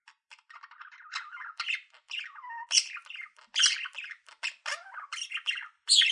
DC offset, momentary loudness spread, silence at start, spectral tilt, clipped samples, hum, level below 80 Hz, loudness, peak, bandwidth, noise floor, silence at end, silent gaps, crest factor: under 0.1%; 19 LU; 0.05 s; 9 dB/octave; under 0.1%; none; under -90 dBFS; -30 LUFS; -8 dBFS; 12 kHz; -58 dBFS; 0 s; none; 26 dB